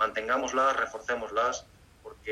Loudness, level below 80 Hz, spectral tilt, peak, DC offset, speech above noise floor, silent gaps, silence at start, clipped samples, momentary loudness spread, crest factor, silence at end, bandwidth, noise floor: -29 LUFS; -60 dBFS; -2 dB/octave; -14 dBFS; under 0.1%; 21 dB; none; 0 s; under 0.1%; 10 LU; 16 dB; 0 s; 14 kHz; -50 dBFS